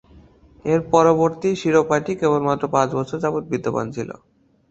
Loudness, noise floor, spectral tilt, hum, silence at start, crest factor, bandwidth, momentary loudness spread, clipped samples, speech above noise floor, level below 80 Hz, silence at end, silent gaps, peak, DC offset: -20 LUFS; -49 dBFS; -6.5 dB/octave; none; 0.65 s; 18 dB; 8 kHz; 11 LU; under 0.1%; 30 dB; -54 dBFS; 0.6 s; none; -2 dBFS; under 0.1%